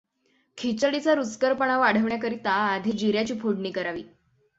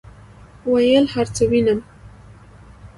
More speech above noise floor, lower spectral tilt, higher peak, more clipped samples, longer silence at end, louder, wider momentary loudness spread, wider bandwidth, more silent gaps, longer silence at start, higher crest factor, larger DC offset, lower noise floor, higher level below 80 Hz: first, 44 dB vs 27 dB; about the same, -5 dB/octave vs -5.5 dB/octave; about the same, -6 dBFS vs -4 dBFS; neither; first, 0.5 s vs 0.1 s; second, -25 LUFS vs -18 LUFS; about the same, 9 LU vs 8 LU; second, 8 kHz vs 11.5 kHz; neither; first, 0.55 s vs 0.05 s; about the same, 18 dB vs 16 dB; neither; first, -69 dBFS vs -44 dBFS; second, -64 dBFS vs -46 dBFS